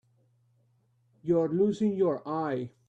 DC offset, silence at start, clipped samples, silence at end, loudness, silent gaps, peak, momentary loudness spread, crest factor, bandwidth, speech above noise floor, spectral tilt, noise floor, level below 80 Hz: under 0.1%; 1.25 s; under 0.1%; 0.2 s; -28 LUFS; none; -16 dBFS; 6 LU; 16 dB; 8.4 kHz; 41 dB; -8.5 dB/octave; -69 dBFS; -72 dBFS